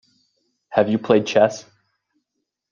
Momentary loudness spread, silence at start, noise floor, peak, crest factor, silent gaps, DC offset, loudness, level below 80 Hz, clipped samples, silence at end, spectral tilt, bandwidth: 7 LU; 0.7 s; -78 dBFS; -2 dBFS; 20 dB; none; under 0.1%; -19 LUFS; -64 dBFS; under 0.1%; 1.1 s; -5.5 dB/octave; 7.4 kHz